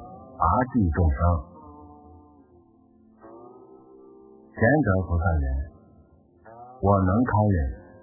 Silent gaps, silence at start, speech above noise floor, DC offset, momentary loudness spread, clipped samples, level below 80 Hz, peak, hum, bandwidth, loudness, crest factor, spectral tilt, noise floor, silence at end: none; 0 s; 35 dB; under 0.1%; 23 LU; under 0.1%; -32 dBFS; -6 dBFS; none; 2.1 kHz; -24 LUFS; 20 dB; -15 dB/octave; -57 dBFS; 0.2 s